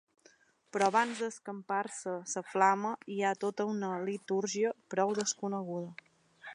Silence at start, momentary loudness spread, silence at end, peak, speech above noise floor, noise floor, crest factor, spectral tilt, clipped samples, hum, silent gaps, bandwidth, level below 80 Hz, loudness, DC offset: 0.75 s; 12 LU; 0 s; -12 dBFS; 33 dB; -66 dBFS; 22 dB; -4 dB/octave; under 0.1%; none; none; 11 kHz; -86 dBFS; -33 LUFS; under 0.1%